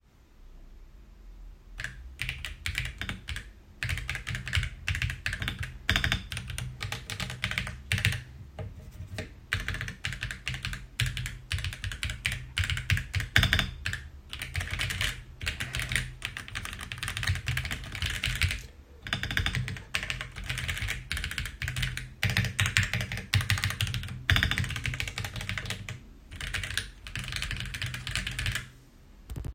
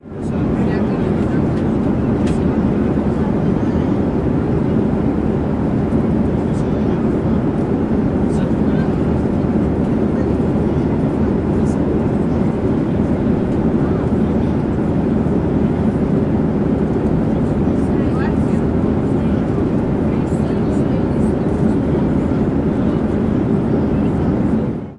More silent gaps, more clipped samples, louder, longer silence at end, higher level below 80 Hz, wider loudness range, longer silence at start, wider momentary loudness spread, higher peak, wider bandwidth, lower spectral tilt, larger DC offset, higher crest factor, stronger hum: neither; neither; second, -32 LUFS vs -17 LUFS; about the same, 0 s vs 0 s; second, -42 dBFS vs -30 dBFS; first, 6 LU vs 0 LU; first, 0.4 s vs 0.05 s; first, 13 LU vs 1 LU; first, -2 dBFS vs -6 dBFS; first, 16.5 kHz vs 10.5 kHz; second, -3 dB/octave vs -9.5 dB/octave; neither; first, 30 dB vs 10 dB; neither